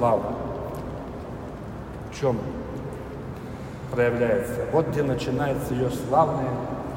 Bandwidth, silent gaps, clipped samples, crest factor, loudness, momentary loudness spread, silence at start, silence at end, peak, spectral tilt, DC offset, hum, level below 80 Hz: 16 kHz; none; under 0.1%; 18 dB; -27 LUFS; 14 LU; 0 s; 0 s; -8 dBFS; -7 dB/octave; under 0.1%; none; -44 dBFS